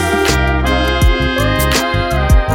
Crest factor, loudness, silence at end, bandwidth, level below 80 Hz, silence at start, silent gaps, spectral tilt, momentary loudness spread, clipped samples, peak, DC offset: 12 dB; -14 LUFS; 0 s; 18.5 kHz; -16 dBFS; 0 s; none; -4.5 dB/octave; 2 LU; under 0.1%; 0 dBFS; under 0.1%